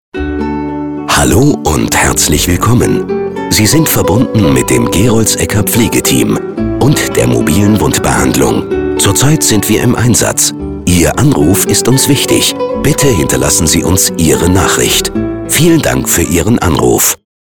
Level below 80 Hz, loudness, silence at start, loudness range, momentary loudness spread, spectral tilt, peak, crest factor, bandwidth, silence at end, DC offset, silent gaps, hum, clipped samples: -26 dBFS; -9 LUFS; 0.15 s; 1 LU; 6 LU; -4 dB/octave; 0 dBFS; 10 dB; over 20 kHz; 0.3 s; under 0.1%; none; none; under 0.1%